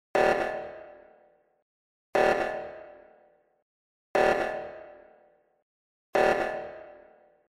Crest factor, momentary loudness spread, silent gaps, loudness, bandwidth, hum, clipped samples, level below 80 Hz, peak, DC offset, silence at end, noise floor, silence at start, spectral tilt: 22 dB; 20 LU; 1.62-2.13 s, 3.62-4.14 s, 5.62-6.13 s; -27 LUFS; 15 kHz; none; under 0.1%; -58 dBFS; -10 dBFS; under 0.1%; 0.6 s; -63 dBFS; 0.15 s; -4.5 dB/octave